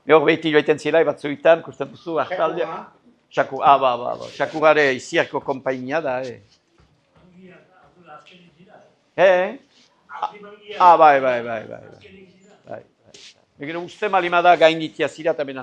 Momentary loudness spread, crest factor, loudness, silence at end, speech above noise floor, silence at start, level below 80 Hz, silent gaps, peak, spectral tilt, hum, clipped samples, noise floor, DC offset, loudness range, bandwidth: 19 LU; 20 dB; -19 LUFS; 0 s; 40 dB; 0.05 s; -68 dBFS; none; 0 dBFS; -5 dB/octave; none; under 0.1%; -58 dBFS; under 0.1%; 9 LU; 9.6 kHz